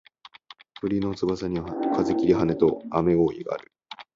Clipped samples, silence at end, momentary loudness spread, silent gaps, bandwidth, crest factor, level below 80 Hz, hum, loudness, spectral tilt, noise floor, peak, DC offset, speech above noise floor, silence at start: under 0.1%; 0.15 s; 12 LU; none; 7.6 kHz; 18 dB; -50 dBFS; none; -25 LUFS; -8 dB/octave; -50 dBFS; -6 dBFS; under 0.1%; 27 dB; 0.85 s